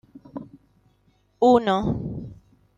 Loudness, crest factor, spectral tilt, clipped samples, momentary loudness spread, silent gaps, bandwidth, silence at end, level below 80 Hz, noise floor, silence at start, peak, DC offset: -21 LUFS; 22 dB; -7.5 dB/octave; under 0.1%; 22 LU; none; 7.6 kHz; 0.45 s; -48 dBFS; -64 dBFS; 0.35 s; -4 dBFS; under 0.1%